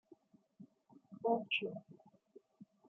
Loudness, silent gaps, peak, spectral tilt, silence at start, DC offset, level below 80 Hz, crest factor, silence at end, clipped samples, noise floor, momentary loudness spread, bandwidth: -38 LUFS; none; -22 dBFS; -2 dB/octave; 0.6 s; under 0.1%; under -90 dBFS; 22 dB; 0.25 s; under 0.1%; -67 dBFS; 27 LU; 6.2 kHz